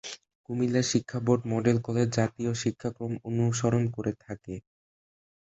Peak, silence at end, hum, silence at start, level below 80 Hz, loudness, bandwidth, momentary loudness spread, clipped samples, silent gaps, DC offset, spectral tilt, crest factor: -10 dBFS; 0.9 s; none; 0.05 s; -58 dBFS; -28 LUFS; 8.2 kHz; 14 LU; under 0.1%; 0.35-0.44 s; under 0.1%; -6 dB/octave; 20 dB